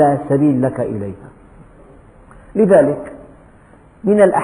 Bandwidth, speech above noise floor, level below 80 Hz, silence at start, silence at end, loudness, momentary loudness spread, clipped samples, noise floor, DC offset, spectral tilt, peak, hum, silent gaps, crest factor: 10.5 kHz; 32 dB; -48 dBFS; 0 s; 0 s; -15 LUFS; 17 LU; under 0.1%; -45 dBFS; under 0.1%; -8.5 dB/octave; -2 dBFS; none; none; 16 dB